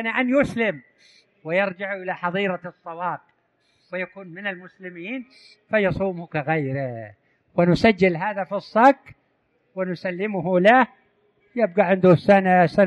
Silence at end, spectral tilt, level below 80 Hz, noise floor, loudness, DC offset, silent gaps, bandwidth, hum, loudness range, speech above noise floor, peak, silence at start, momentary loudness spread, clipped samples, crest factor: 0 s; -7.5 dB/octave; -54 dBFS; -67 dBFS; -21 LUFS; under 0.1%; none; 11 kHz; none; 9 LU; 46 dB; -4 dBFS; 0 s; 18 LU; under 0.1%; 18 dB